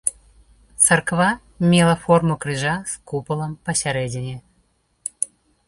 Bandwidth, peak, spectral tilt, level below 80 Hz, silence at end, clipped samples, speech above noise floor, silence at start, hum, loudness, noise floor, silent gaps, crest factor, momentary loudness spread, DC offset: 12 kHz; -2 dBFS; -4 dB/octave; -50 dBFS; 0.4 s; under 0.1%; 44 dB; 0.05 s; none; -20 LUFS; -64 dBFS; none; 20 dB; 14 LU; under 0.1%